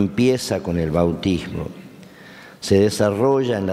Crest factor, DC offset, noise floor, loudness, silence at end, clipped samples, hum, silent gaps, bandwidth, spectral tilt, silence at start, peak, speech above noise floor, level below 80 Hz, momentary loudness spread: 16 dB; under 0.1%; -42 dBFS; -20 LUFS; 0 s; under 0.1%; none; none; 15 kHz; -6 dB/octave; 0 s; -4 dBFS; 23 dB; -44 dBFS; 13 LU